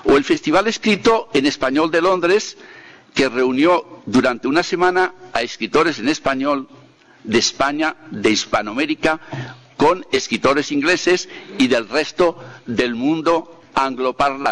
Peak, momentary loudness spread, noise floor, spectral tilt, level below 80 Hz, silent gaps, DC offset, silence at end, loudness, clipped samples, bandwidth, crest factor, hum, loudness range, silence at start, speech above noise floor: -6 dBFS; 7 LU; -46 dBFS; -4 dB/octave; -48 dBFS; none; under 0.1%; 0 s; -18 LUFS; under 0.1%; 10.5 kHz; 12 dB; none; 2 LU; 0.05 s; 28 dB